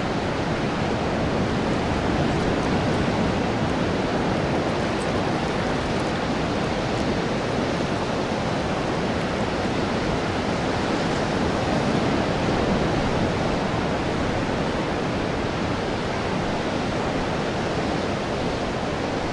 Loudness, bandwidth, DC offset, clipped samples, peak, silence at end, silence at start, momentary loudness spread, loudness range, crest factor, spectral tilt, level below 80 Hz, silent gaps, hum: -24 LUFS; 11.5 kHz; under 0.1%; under 0.1%; -10 dBFS; 0 s; 0 s; 3 LU; 2 LU; 14 dB; -6 dB/octave; -38 dBFS; none; none